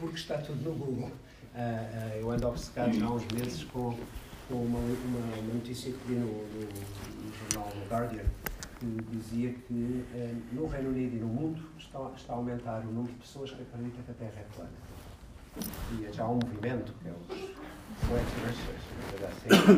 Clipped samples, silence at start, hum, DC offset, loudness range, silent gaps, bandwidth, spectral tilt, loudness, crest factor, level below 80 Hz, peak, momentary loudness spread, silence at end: under 0.1%; 0 s; none; under 0.1%; 6 LU; none; 15.5 kHz; -5.5 dB/octave; -35 LUFS; 26 dB; -48 dBFS; -6 dBFS; 11 LU; 0 s